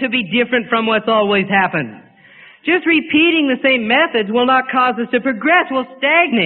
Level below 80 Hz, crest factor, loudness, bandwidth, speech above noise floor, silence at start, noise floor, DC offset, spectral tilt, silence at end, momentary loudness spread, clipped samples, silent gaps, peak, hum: -58 dBFS; 14 dB; -14 LUFS; 4.4 kHz; 29 dB; 0 s; -44 dBFS; under 0.1%; -10 dB/octave; 0 s; 5 LU; under 0.1%; none; 0 dBFS; none